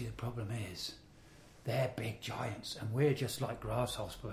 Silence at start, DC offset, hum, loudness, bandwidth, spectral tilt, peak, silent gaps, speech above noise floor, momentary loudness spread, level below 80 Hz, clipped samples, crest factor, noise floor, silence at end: 0 s; under 0.1%; none; -38 LUFS; 16 kHz; -5.5 dB/octave; -20 dBFS; none; 21 dB; 10 LU; -58 dBFS; under 0.1%; 18 dB; -59 dBFS; 0 s